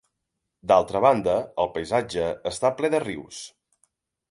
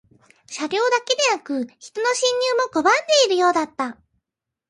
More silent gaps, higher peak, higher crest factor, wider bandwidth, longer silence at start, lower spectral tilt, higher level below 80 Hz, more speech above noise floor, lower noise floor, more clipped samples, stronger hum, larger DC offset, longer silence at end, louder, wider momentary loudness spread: neither; about the same, -6 dBFS vs -4 dBFS; about the same, 20 dB vs 16 dB; about the same, 11.5 kHz vs 11.5 kHz; first, 0.65 s vs 0.5 s; first, -5 dB/octave vs -0.5 dB/octave; first, -56 dBFS vs -70 dBFS; second, 58 dB vs 64 dB; second, -81 dBFS vs -85 dBFS; neither; neither; neither; about the same, 0.85 s vs 0.75 s; second, -23 LUFS vs -20 LUFS; first, 17 LU vs 13 LU